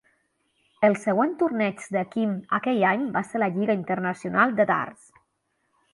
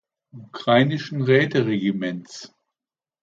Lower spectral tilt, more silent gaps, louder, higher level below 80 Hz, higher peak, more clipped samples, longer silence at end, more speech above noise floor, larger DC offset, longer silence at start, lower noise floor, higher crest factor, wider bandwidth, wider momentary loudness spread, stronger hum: about the same, -6.5 dB/octave vs -6.5 dB/octave; neither; second, -24 LUFS vs -21 LUFS; about the same, -70 dBFS vs -66 dBFS; about the same, -6 dBFS vs -4 dBFS; neither; first, 1 s vs 0.75 s; second, 50 dB vs over 69 dB; neither; first, 0.8 s vs 0.35 s; second, -74 dBFS vs under -90 dBFS; about the same, 20 dB vs 18 dB; first, 11.5 kHz vs 7.8 kHz; second, 6 LU vs 20 LU; neither